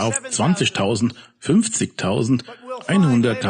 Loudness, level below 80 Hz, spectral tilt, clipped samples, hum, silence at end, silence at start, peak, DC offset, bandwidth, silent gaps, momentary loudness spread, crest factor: -19 LUFS; -56 dBFS; -5 dB/octave; under 0.1%; none; 0 s; 0 s; -6 dBFS; under 0.1%; 10 kHz; none; 8 LU; 12 dB